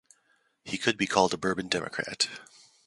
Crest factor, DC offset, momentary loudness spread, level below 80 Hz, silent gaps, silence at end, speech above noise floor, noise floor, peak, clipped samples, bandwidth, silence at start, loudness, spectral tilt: 26 dB; under 0.1%; 12 LU; -64 dBFS; none; 0.4 s; 41 dB; -70 dBFS; -4 dBFS; under 0.1%; 11.5 kHz; 0.65 s; -28 LUFS; -3 dB/octave